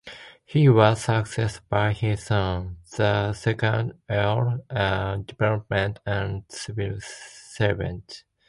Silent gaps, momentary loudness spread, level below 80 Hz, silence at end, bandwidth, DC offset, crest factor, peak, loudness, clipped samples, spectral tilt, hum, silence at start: none; 15 LU; -44 dBFS; 0.3 s; 11.5 kHz; under 0.1%; 22 dB; -2 dBFS; -24 LUFS; under 0.1%; -6.5 dB/octave; none; 0.05 s